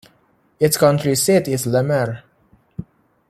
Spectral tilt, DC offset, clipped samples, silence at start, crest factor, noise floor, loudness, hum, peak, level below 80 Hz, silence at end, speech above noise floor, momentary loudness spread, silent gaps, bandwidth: -5 dB/octave; under 0.1%; under 0.1%; 0.6 s; 18 dB; -59 dBFS; -17 LUFS; none; -2 dBFS; -56 dBFS; 0.45 s; 42 dB; 20 LU; none; 16 kHz